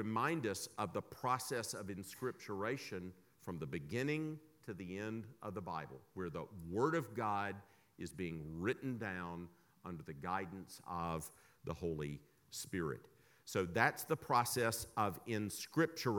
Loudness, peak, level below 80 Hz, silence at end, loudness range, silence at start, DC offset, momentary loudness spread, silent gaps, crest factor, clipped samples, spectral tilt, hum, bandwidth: -41 LUFS; -16 dBFS; -68 dBFS; 0 s; 7 LU; 0 s; under 0.1%; 15 LU; none; 26 dB; under 0.1%; -5 dB/octave; none; 19 kHz